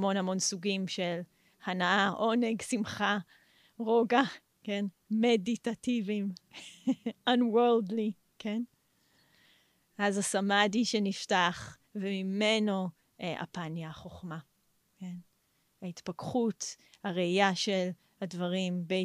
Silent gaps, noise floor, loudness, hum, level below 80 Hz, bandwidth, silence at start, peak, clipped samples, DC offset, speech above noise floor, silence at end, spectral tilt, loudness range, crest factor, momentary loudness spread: none; -73 dBFS; -31 LUFS; none; -74 dBFS; 14.5 kHz; 0 s; -12 dBFS; under 0.1%; under 0.1%; 42 dB; 0 s; -4.5 dB/octave; 8 LU; 22 dB; 17 LU